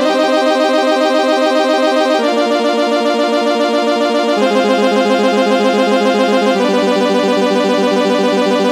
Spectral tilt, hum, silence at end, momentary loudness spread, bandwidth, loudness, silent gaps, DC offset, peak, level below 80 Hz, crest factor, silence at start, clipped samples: -4.5 dB/octave; none; 0 s; 1 LU; 15.5 kHz; -13 LUFS; none; under 0.1%; 0 dBFS; -78 dBFS; 12 dB; 0 s; under 0.1%